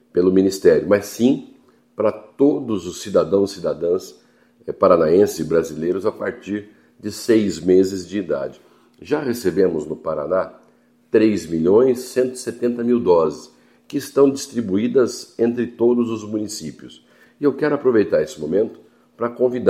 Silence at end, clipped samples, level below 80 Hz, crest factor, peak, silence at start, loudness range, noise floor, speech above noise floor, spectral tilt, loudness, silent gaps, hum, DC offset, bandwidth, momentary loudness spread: 0 s; under 0.1%; -60 dBFS; 18 dB; 0 dBFS; 0.15 s; 3 LU; -56 dBFS; 37 dB; -6 dB/octave; -19 LUFS; none; none; under 0.1%; 15.5 kHz; 12 LU